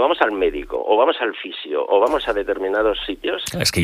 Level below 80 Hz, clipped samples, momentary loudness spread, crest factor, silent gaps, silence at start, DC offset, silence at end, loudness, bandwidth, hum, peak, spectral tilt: -44 dBFS; under 0.1%; 8 LU; 18 dB; none; 0 s; under 0.1%; 0 s; -20 LUFS; 15.5 kHz; none; -2 dBFS; -4 dB/octave